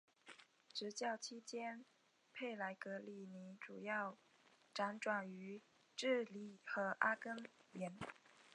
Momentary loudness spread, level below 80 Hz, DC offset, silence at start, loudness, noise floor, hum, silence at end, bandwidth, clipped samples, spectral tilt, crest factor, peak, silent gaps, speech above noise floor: 17 LU; under -90 dBFS; under 0.1%; 0.25 s; -46 LUFS; -66 dBFS; none; 0 s; 11 kHz; under 0.1%; -4 dB/octave; 28 dB; -20 dBFS; none; 20 dB